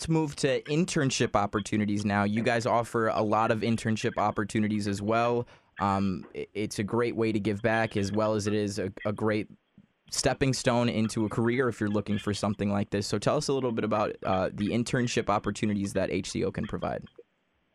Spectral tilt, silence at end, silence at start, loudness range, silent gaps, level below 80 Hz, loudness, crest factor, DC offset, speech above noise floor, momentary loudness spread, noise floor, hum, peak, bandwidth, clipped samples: -5.5 dB/octave; 0.55 s; 0 s; 2 LU; none; -56 dBFS; -28 LUFS; 18 dB; under 0.1%; 45 dB; 6 LU; -73 dBFS; none; -10 dBFS; 13 kHz; under 0.1%